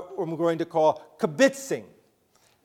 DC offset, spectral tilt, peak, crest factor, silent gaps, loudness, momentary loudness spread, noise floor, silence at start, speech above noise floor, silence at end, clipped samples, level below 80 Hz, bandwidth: under 0.1%; -5 dB/octave; -6 dBFS; 20 dB; none; -25 LUFS; 11 LU; -64 dBFS; 0 s; 39 dB; 0.8 s; under 0.1%; -76 dBFS; 16.5 kHz